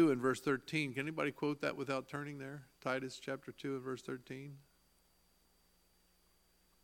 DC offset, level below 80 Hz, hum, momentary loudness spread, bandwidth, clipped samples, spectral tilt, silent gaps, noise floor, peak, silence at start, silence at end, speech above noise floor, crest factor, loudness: under 0.1%; -78 dBFS; none; 12 LU; 17 kHz; under 0.1%; -5.5 dB/octave; none; -73 dBFS; -20 dBFS; 0 s; 2.25 s; 33 dB; 20 dB; -40 LUFS